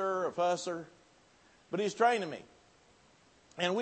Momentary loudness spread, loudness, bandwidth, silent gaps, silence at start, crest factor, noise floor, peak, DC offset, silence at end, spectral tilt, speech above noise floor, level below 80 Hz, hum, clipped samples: 18 LU; -33 LUFS; 8.4 kHz; none; 0 s; 20 dB; -64 dBFS; -14 dBFS; under 0.1%; 0 s; -4 dB/octave; 32 dB; -80 dBFS; none; under 0.1%